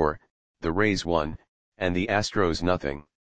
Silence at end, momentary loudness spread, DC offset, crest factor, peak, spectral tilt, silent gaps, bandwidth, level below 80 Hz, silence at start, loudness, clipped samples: 0.05 s; 10 LU; 0.8%; 20 dB; -6 dBFS; -5.5 dB/octave; 0.30-0.54 s, 1.48-1.72 s; 9.8 kHz; -44 dBFS; 0 s; -26 LUFS; under 0.1%